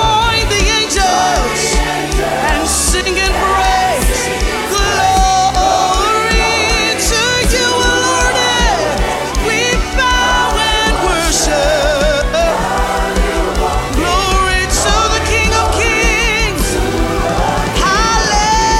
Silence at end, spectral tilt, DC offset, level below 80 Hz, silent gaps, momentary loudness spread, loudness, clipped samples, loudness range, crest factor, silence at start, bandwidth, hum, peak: 0 s; -3 dB/octave; under 0.1%; -20 dBFS; none; 4 LU; -12 LUFS; under 0.1%; 2 LU; 12 dB; 0 s; 16 kHz; none; 0 dBFS